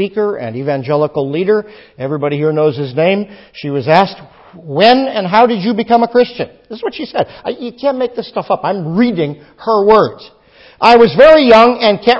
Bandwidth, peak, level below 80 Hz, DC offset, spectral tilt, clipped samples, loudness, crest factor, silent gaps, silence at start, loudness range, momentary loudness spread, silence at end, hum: 8 kHz; 0 dBFS; -48 dBFS; under 0.1%; -7 dB/octave; 0.4%; -12 LUFS; 12 dB; none; 0 s; 7 LU; 15 LU; 0 s; none